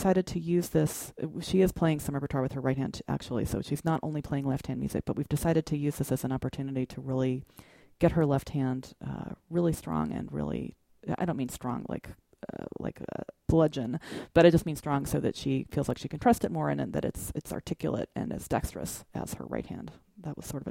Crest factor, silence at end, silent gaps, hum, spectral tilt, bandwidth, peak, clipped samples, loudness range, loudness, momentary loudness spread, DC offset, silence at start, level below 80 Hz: 24 dB; 0 s; none; none; -6.5 dB/octave; 16.5 kHz; -6 dBFS; under 0.1%; 7 LU; -31 LUFS; 13 LU; under 0.1%; 0 s; -50 dBFS